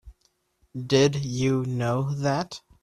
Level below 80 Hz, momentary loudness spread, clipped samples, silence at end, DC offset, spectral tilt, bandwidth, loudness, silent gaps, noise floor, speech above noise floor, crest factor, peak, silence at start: -54 dBFS; 15 LU; under 0.1%; 0.25 s; under 0.1%; -6 dB/octave; 12 kHz; -25 LUFS; none; -69 dBFS; 45 dB; 20 dB; -6 dBFS; 0.05 s